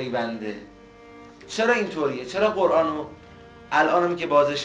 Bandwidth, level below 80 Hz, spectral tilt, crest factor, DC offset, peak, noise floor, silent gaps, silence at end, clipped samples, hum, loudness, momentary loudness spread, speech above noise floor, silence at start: 9.8 kHz; -58 dBFS; -4.5 dB/octave; 16 dB; under 0.1%; -8 dBFS; -46 dBFS; none; 0 s; under 0.1%; none; -23 LUFS; 13 LU; 23 dB; 0 s